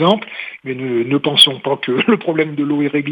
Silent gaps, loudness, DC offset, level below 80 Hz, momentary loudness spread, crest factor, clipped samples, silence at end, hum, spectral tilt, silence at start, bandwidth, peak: none; -15 LUFS; under 0.1%; -68 dBFS; 15 LU; 16 dB; under 0.1%; 0 s; none; -4.5 dB/octave; 0 s; 16.5 kHz; 0 dBFS